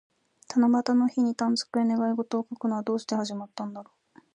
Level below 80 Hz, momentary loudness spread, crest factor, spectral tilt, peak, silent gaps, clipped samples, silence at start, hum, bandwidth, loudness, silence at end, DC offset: -78 dBFS; 13 LU; 16 dB; -5 dB/octave; -12 dBFS; none; under 0.1%; 0.5 s; none; 10 kHz; -27 LUFS; 0.5 s; under 0.1%